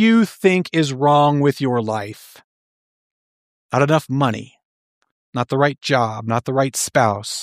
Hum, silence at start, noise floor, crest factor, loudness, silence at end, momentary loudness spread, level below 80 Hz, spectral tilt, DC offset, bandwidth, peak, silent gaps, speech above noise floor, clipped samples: none; 0 s; under -90 dBFS; 18 dB; -18 LUFS; 0 s; 10 LU; -62 dBFS; -5.5 dB/octave; under 0.1%; 15.5 kHz; -2 dBFS; 2.44-3.69 s, 4.65-5.01 s, 5.12-5.33 s; over 72 dB; under 0.1%